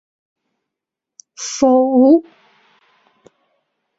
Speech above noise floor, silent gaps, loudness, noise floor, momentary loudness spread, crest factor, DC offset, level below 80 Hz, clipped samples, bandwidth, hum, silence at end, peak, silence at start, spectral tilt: 71 dB; none; -13 LUFS; -84 dBFS; 15 LU; 18 dB; under 0.1%; -62 dBFS; under 0.1%; 8 kHz; none; 1.75 s; 0 dBFS; 1.4 s; -4 dB/octave